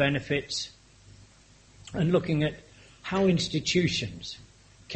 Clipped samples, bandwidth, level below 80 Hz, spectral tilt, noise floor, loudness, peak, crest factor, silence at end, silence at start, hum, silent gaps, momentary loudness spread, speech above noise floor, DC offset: under 0.1%; 8.4 kHz; -54 dBFS; -5 dB/octave; -57 dBFS; -27 LUFS; -10 dBFS; 20 dB; 0 s; 0 s; none; none; 15 LU; 30 dB; under 0.1%